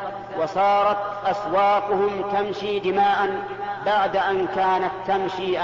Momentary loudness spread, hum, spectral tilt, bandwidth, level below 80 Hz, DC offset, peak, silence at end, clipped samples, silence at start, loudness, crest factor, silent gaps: 6 LU; none; -5.5 dB/octave; 7.6 kHz; -56 dBFS; under 0.1%; -10 dBFS; 0 s; under 0.1%; 0 s; -22 LUFS; 12 dB; none